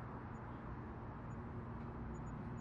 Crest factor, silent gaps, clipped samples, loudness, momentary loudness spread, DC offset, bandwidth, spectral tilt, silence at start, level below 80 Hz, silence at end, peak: 12 dB; none; under 0.1%; -49 LUFS; 2 LU; under 0.1%; 7.4 kHz; -8.5 dB/octave; 0 s; -56 dBFS; 0 s; -36 dBFS